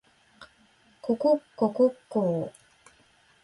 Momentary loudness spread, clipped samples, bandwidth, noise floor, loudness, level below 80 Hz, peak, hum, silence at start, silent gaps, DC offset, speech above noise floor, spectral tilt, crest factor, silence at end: 11 LU; under 0.1%; 11.5 kHz; -62 dBFS; -27 LUFS; -70 dBFS; -12 dBFS; none; 0.4 s; none; under 0.1%; 36 dB; -8.5 dB/octave; 18 dB; 0.95 s